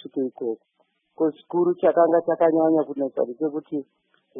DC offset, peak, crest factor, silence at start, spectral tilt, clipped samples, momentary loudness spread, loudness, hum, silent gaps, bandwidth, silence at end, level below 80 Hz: under 0.1%; -6 dBFS; 16 dB; 0.05 s; -11.5 dB/octave; under 0.1%; 12 LU; -23 LUFS; none; none; 3.8 kHz; 0 s; -76 dBFS